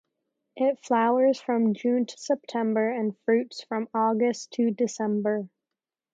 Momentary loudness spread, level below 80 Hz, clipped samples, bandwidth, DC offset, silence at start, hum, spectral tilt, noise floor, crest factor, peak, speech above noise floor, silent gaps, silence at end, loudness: 7 LU; -82 dBFS; under 0.1%; 7.8 kHz; under 0.1%; 0.55 s; none; -5.5 dB/octave; -89 dBFS; 16 dB; -10 dBFS; 63 dB; none; 0.65 s; -26 LUFS